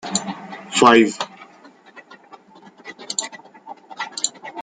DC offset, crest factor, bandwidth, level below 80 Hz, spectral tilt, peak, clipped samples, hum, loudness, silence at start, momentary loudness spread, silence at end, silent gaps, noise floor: under 0.1%; 22 dB; 9.6 kHz; -66 dBFS; -2.5 dB/octave; -2 dBFS; under 0.1%; none; -19 LUFS; 0.05 s; 28 LU; 0 s; none; -48 dBFS